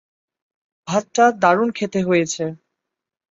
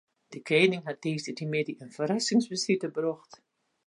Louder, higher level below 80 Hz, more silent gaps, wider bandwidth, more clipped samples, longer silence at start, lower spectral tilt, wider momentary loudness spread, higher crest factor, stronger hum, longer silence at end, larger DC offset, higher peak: first, -19 LUFS vs -29 LUFS; first, -64 dBFS vs -80 dBFS; neither; second, 8 kHz vs 11.5 kHz; neither; first, 0.85 s vs 0.3 s; about the same, -5 dB/octave vs -4.5 dB/octave; about the same, 11 LU vs 12 LU; about the same, 20 dB vs 20 dB; neither; first, 0.8 s vs 0.5 s; neither; first, -2 dBFS vs -8 dBFS